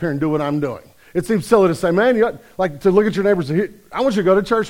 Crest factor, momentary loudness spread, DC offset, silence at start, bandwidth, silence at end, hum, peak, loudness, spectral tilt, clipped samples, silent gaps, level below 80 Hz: 16 dB; 10 LU; 0.1%; 0 s; 16.5 kHz; 0 s; none; -2 dBFS; -18 LUFS; -6.5 dB/octave; under 0.1%; none; -48 dBFS